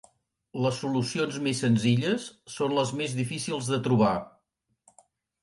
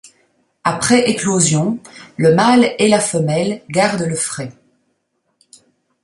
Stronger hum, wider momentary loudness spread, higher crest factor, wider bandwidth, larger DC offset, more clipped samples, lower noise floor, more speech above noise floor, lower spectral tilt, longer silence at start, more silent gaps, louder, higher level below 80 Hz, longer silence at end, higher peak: neither; about the same, 8 LU vs 10 LU; about the same, 18 dB vs 16 dB; about the same, 11.5 kHz vs 11.5 kHz; neither; neither; first, -76 dBFS vs -68 dBFS; second, 49 dB vs 53 dB; about the same, -5.5 dB/octave vs -4.5 dB/octave; about the same, 0.55 s vs 0.65 s; neither; second, -27 LUFS vs -15 LUFS; second, -64 dBFS vs -54 dBFS; second, 1.15 s vs 1.5 s; second, -10 dBFS vs 0 dBFS